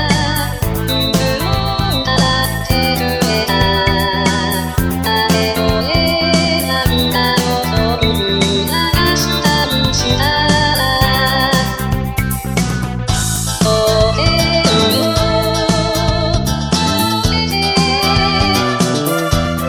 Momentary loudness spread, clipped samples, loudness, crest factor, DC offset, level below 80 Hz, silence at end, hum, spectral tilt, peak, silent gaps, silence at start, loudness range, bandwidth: 5 LU; under 0.1%; -14 LUFS; 14 dB; under 0.1%; -26 dBFS; 0 s; none; -4.5 dB/octave; 0 dBFS; none; 0 s; 2 LU; over 20 kHz